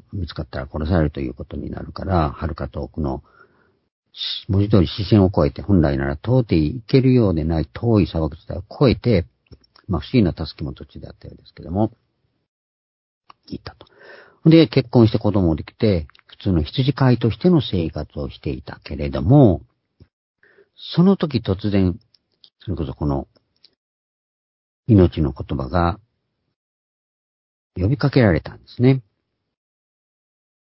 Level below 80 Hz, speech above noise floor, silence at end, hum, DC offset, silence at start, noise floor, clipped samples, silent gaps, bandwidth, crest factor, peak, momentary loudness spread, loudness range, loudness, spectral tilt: -34 dBFS; 56 dB; 1.65 s; none; under 0.1%; 0.1 s; -74 dBFS; under 0.1%; 3.92-4.03 s, 12.48-13.21 s, 20.13-20.35 s, 23.77-24.83 s, 26.56-27.70 s; 5.8 kHz; 20 dB; 0 dBFS; 17 LU; 8 LU; -19 LUFS; -11.5 dB/octave